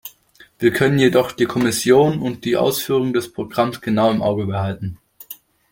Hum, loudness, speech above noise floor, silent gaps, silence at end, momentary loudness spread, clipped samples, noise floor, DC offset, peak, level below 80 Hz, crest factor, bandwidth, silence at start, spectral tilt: none; -18 LUFS; 33 dB; none; 0.4 s; 17 LU; under 0.1%; -51 dBFS; under 0.1%; -2 dBFS; -54 dBFS; 16 dB; 17 kHz; 0.05 s; -5.5 dB/octave